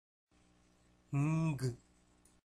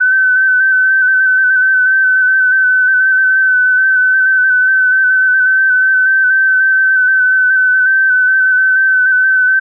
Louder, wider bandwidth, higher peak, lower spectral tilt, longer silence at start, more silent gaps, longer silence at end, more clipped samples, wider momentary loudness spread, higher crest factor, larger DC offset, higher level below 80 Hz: second, -37 LUFS vs -9 LUFS; first, 12 kHz vs 1.7 kHz; second, -26 dBFS vs -6 dBFS; first, -7.5 dB/octave vs 8.5 dB/octave; first, 1.1 s vs 0 s; neither; first, 0.7 s vs 0 s; neither; first, 9 LU vs 0 LU; first, 14 dB vs 4 dB; neither; first, -66 dBFS vs under -90 dBFS